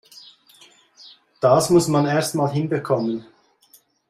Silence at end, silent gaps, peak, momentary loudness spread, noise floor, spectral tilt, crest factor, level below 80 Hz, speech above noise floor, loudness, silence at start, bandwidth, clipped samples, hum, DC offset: 0.85 s; none; -4 dBFS; 8 LU; -56 dBFS; -5.5 dB/octave; 18 dB; -58 dBFS; 38 dB; -20 LUFS; 1.05 s; 15 kHz; under 0.1%; none; under 0.1%